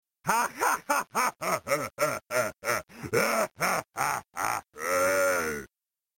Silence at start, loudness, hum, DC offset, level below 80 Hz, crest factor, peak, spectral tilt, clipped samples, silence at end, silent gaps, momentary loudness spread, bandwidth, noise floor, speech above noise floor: 0.25 s; -28 LUFS; none; under 0.1%; -62 dBFS; 18 dB; -12 dBFS; -2.5 dB/octave; under 0.1%; 0.5 s; none; 6 LU; 17 kHz; -87 dBFS; 58 dB